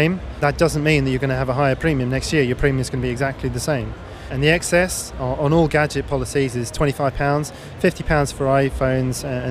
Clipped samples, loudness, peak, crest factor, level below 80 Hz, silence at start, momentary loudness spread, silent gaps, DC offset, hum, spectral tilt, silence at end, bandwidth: under 0.1%; -20 LUFS; -2 dBFS; 16 dB; -34 dBFS; 0 s; 6 LU; none; under 0.1%; none; -5.5 dB/octave; 0 s; 15.5 kHz